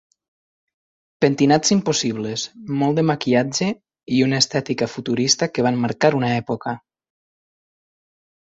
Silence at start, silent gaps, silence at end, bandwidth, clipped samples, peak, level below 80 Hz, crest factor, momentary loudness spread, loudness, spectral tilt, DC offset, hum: 1.2 s; none; 1.7 s; 8 kHz; under 0.1%; -2 dBFS; -58 dBFS; 20 dB; 10 LU; -20 LUFS; -4.5 dB/octave; under 0.1%; none